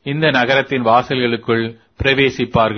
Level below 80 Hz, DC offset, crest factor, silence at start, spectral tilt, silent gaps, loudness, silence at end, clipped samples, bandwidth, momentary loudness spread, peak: -40 dBFS; under 0.1%; 16 dB; 0.05 s; -6 dB/octave; none; -15 LUFS; 0 s; under 0.1%; 6.6 kHz; 5 LU; 0 dBFS